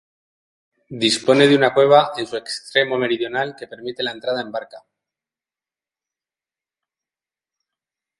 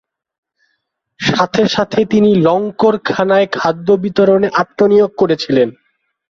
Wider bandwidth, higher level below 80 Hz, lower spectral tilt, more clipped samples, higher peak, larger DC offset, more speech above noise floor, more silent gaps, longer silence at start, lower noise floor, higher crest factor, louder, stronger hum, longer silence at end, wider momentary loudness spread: first, 11.5 kHz vs 7.4 kHz; second, -68 dBFS vs -52 dBFS; second, -4 dB/octave vs -6 dB/octave; neither; about the same, 0 dBFS vs -2 dBFS; neither; first, over 72 dB vs 56 dB; neither; second, 0.9 s vs 1.2 s; first, under -90 dBFS vs -69 dBFS; first, 20 dB vs 12 dB; second, -18 LUFS vs -13 LUFS; neither; first, 3.4 s vs 0.6 s; first, 16 LU vs 5 LU